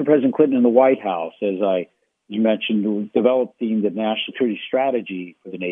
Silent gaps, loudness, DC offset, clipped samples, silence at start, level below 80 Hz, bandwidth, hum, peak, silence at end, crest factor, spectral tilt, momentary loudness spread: none; -20 LUFS; under 0.1%; under 0.1%; 0 s; -74 dBFS; 3.8 kHz; none; -2 dBFS; 0 s; 18 dB; -9.5 dB/octave; 13 LU